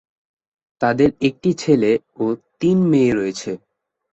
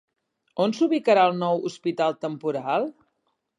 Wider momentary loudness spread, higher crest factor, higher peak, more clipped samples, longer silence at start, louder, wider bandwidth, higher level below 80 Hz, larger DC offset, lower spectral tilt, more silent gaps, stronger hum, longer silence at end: about the same, 9 LU vs 10 LU; about the same, 16 dB vs 18 dB; first, -2 dBFS vs -6 dBFS; neither; first, 0.8 s vs 0.55 s; first, -18 LUFS vs -24 LUFS; second, 8.2 kHz vs 11 kHz; first, -54 dBFS vs -80 dBFS; neither; about the same, -6.5 dB/octave vs -6 dB/octave; neither; neither; second, 0.55 s vs 0.7 s